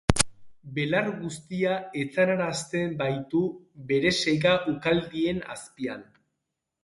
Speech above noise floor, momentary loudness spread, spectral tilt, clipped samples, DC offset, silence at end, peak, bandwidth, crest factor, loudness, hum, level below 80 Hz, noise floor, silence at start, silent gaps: 56 dB; 12 LU; -4.5 dB/octave; under 0.1%; under 0.1%; 0.8 s; 0 dBFS; 11.5 kHz; 26 dB; -27 LUFS; none; -48 dBFS; -83 dBFS; 0.1 s; none